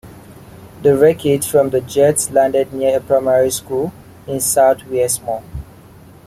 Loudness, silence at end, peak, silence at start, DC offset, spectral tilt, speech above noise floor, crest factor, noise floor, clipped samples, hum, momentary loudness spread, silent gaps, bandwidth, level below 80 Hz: -15 LUFS; 0.65 s; -2 dBFS; 0.05 s; under 0.1%; -4.5 dB/octave; 26 dB; 14 dB; -41 dBFS; under 0.1%; none; 13 LU; none; 16 kHz; -44 dBFS